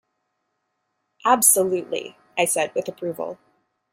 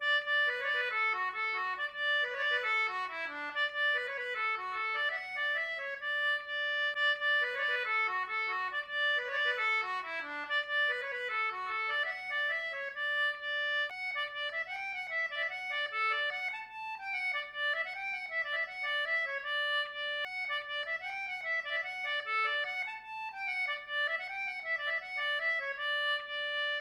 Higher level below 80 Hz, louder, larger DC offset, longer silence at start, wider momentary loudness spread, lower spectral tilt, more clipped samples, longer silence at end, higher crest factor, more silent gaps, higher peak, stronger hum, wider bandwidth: first, -72 dBFS vs -78 dBFS; first, -21 LUFS vs -33 LUFS; neither; first, 1.25 s vs 0 s; first, 16 LU vs 7 LU; first, -2 dB/octave vs -0.5 dB/octave; neither; first, 0.6 s vs 0 s; first, 22 dB vs 12 dB; neither; first, -2 dBFS vs -22 dBFS; neither; first, 16.5 kHz vs 13.5 kHz